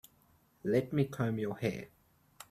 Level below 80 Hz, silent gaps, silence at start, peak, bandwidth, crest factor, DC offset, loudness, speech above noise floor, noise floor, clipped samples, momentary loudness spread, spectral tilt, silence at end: -68 dBFS; none; 0.65 s; -16 dBFS; 14.5 kHz; 20 dB; under 0.1%; -34 LUFS; 35 dB; -68 dBFS; under 0.1%; 18 LU; -7.5 dB/octave; 0.1 s